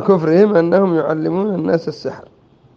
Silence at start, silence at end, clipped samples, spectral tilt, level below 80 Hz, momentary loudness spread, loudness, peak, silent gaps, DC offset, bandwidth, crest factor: 0 s; 0.55 s; under 0.1%; -9 dB/octave; -60 dBFS; 13 LU; -15 LUFS; 0 dBFS; none; under 0.1%; 7 kHz; 16 dB